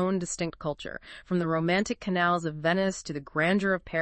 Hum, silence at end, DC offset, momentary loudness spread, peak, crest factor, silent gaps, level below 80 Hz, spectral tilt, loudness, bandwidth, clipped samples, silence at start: none; 0 s; under 0.1%; 10 LU; -12 dBFS; 16 dB; none; -56 dBFS; -5 dB/octave; -28 LUFS; 8.8 kHz; under 0.1%; 0 s